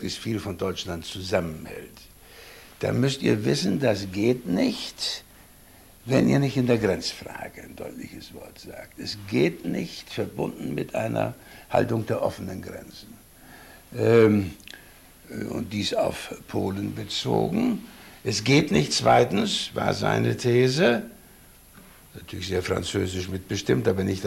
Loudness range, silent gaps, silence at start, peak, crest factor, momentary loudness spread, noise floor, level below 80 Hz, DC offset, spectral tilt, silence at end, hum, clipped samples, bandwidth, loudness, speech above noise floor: 7 LU; none; 0 s; -6 dBFS; 20 dB; 20 LU; -51 dBFS; -52 dBFS; under 0.1%; -5.5 dB/octave; 0 s; none; under 0.1%; 16 kHz; -25 LUFS; 26 dB